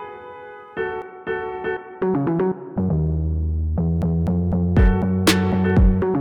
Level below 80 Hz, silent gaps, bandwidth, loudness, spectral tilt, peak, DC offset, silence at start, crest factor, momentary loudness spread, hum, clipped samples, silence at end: -26 dBFS; none; 18 kHz; -21 LUFS; -6.5 dB/octave; -6 dBFS; under 0.1%; 0 s; 14 dB; 11 LU; none; under 0.1%; 0 s